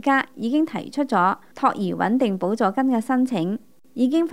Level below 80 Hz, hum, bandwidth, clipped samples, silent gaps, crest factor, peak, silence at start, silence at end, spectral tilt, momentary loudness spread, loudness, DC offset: -72 dBFS; none; 13 kHz; under 0.1%; none; 16 dB; -6 dBFS; 0.05 s; 0 s; -6.5 dB/octave; 6 LU; -22 LUFS; 0.3%